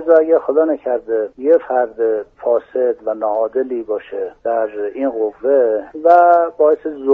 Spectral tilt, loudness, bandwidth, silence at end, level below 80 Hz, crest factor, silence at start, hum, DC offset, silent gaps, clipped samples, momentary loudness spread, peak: -4 dB/octave; -16 LUFS; 3.7 kHz; 0 s; -60 dBFS; 16 dB; 0 s; none; under 0.1%; none; under 0.1%; 9 LU; 0 dBFS